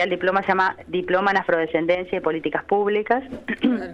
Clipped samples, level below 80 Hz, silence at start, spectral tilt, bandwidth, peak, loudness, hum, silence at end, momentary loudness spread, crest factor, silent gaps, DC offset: under 0.1%; -56 dBFS; 0 s; -6.5 dB/octave; 8 kHz; -4 dBFS; -22 LUFS; none; 0 s; 5 LU; 16 dB; none; under 0.1%